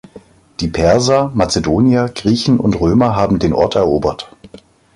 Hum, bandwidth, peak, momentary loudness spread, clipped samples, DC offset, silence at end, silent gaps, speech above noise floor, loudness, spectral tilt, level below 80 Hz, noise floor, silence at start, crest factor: none; 11.5 kHz; 0 dBFS; 9 LU; under 0.1%; under 0.1%; 0.4 s; none; 28 dB; -14 LUFS; -6 dB/octave; -34 dBFS; -41 dBFS; 0.15 s; 14 dB